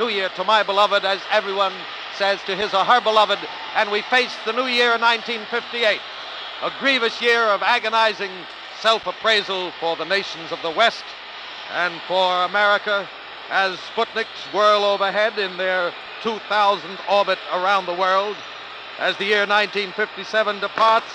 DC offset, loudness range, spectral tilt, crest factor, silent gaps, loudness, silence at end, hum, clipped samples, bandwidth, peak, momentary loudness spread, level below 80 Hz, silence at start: under 0.1%; 3 LU; -2.5 dB/octave; 18 dB; none; -20 LUFS; 0 s; none; under 0.1%; 11 kHz; -2 dBFS; 11 LU; -66 dBFS; 0 s